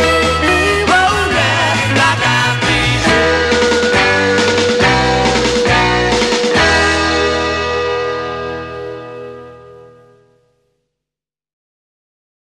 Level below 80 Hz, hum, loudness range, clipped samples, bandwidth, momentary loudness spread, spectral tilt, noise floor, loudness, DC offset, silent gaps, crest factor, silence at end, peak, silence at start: -32 dBFS; none; 12 LU; under 0.1%; 13 kHz; 11 LU; -4 dB/octave; -87 dBFS; -12 LUFS; under 0.1%; none; 14 dB; 2.75 s; 0 dBFS; 0 s